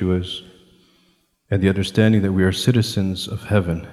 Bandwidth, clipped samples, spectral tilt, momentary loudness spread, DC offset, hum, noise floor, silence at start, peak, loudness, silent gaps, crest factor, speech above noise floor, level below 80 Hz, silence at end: 14 kHz; under 0.1%; -6.5 dB/octave; 9 LU; under 0.1%; none; -62 dBFS; 0 s; -2 dBFS; -19 LUFS; none; 18 dB; 43 dB; -46 dBFS; 0 s